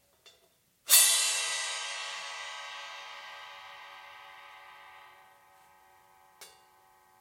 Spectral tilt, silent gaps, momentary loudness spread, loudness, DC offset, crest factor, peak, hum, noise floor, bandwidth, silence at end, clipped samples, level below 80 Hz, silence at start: 5 dB/octave; none; 29 LU; -26 LUFS; under 0.1%; 30 dB; -4 dBFS; none; -68 dBFS; 16.5 kHz; 0.7 s; under 0.1%; -86 dBFS; 0.25 s